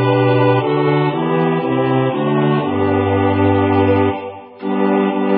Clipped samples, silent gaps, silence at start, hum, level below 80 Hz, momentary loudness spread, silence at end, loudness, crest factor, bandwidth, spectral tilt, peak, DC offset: under 0.1%; none; 0 s; none; -40 dBFS; 5 LU; 0 s; -15 LUFS; 12 dB; 4.8 kHz; -13 dB/octave; -2 dBFS; under 0.1%